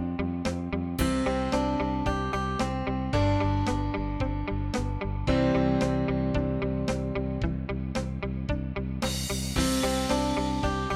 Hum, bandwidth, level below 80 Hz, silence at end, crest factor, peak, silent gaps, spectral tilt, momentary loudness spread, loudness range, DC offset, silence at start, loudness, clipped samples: none; 16.5 kHz; -36 dBFS; 0 s; 16 dB; -12 dBFS; none; -6 dB/octave; 6 LU; 2 LU; under 0.1%; 0 s; -28 LUFS; under 0.1%